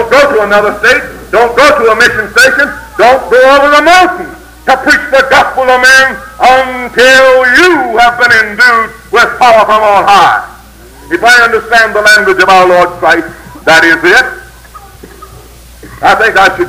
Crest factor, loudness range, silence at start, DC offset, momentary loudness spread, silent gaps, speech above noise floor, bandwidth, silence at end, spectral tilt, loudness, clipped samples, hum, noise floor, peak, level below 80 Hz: 6 dB; 2 LU; 0 s; under 0.1%; 7 LU; none; 27 dB; 18.5 kHz; 0 s; -2.5 dB/octave; -5 LUFS; 5%; none; -32 dBFS; 0 dBFS; -36 dBFS